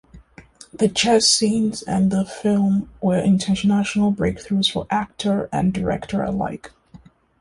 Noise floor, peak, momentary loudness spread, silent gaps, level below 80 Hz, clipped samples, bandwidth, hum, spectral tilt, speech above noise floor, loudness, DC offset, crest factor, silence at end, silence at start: -48 dBFS; -4 dBFS; 9 LU; none; -46 dBFS; under 0.1%; 11.5 kHz; none; -4.5 dB/octave; 28 dB; -20 LUFS; under 0.1%; 16 dB; 0.45 s; 0.15 s